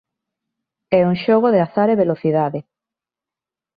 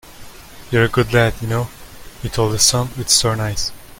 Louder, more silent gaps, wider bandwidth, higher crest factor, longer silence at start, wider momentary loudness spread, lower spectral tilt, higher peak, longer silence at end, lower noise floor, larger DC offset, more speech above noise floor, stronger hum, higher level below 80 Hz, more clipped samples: about the same, -17 LUFS vs -17 LUFS; neither; second, 5 kHz vs 17 kHz; about the same, 16 dB vs 18 dB; first, 0.9 s vs 0.05 s; second, 6 LU vs 10 LU; first, -10.5 dB/octave vs -3.5 dB/octave; second, -4 dBFS vs 0 dBFS; first, 1.15 s vs 0.05 s; first, -88 dBFS vs -37 dBFS; neither; first, 72 dB vs 20 dB; neither; second, -60 dBFS vs -36 dBFS; neither